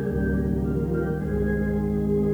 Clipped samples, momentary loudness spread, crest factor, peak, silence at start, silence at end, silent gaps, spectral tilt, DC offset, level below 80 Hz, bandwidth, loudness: under 0.1%; 2 LU; 12 dB; -12 dBFS; 0 s; 0 s; none; -10 dB/octave; under 0.1%; -32 dBFS; over 20 kHz; -25 LUFS